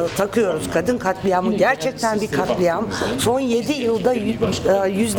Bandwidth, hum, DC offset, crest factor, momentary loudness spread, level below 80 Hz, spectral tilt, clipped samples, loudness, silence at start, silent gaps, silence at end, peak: 20 kHz; none; under 0.1%; 14 dB; 3 LU; -46 dBFS; -5 dB/octave; under 0.1%; -20 LUFS; 0 s; none; 0 s; -4 dBFS